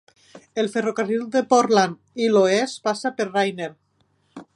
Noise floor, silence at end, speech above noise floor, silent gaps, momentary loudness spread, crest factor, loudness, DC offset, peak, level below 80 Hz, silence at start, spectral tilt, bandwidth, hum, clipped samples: -65 dBFS; 0.15 s; 45 dB; none; 9 LU; 20 dB; -21 LUFS; under 0.1%; -2 dBFS; -74 dBFS; 0.35 s; -4.5 dB/octave; 11.5 kHz; none; under 0.1%